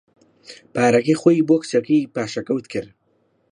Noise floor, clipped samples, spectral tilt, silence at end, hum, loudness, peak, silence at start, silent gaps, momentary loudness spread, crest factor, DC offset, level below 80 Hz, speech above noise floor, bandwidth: -64 dBFS; under 0.1%; -6 dB/octave; 0.65 s; none; -19 LUFS; -2 dBFS; 0.5 s; none; 12 LU; 18 dB; under 0.1%; -64 dBFS; 45 dB; 10.5 kHz